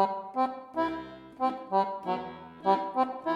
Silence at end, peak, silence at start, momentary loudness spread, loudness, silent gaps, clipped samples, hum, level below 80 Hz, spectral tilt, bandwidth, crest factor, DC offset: 0 s; -10 dBFS; 0 s; 8 LU; -31 LUFS; none; under 0.1%; none; -68 dBFS; -7 dB/octave; 11 kHz; 20 dB; under 0.1%